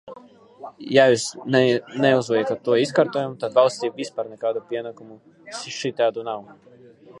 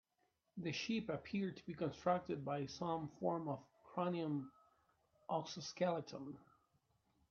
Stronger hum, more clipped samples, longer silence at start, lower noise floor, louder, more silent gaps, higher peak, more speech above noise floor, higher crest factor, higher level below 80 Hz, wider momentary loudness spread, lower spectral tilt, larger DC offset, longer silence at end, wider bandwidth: neither; neither; second, 0.05 s vs 0.55 s; second, -47 dBFS vs -84 dBFS; first, -21 LUFS vs -43 LUFS; neither; first, -2 dBFS vs -24 dBFS; second, 26 dB vs 41 dB; about the same, 22 dB vs 20 dB; first, -70 dBFS vs -78 dBFS; first, 16 LU vs 11 LU; about the same, -4.5 dB/octave vs -5 dB/octave; neither; second, 0 s vs 0.85 s; first, 11.5 kHz vs 7.2 kHz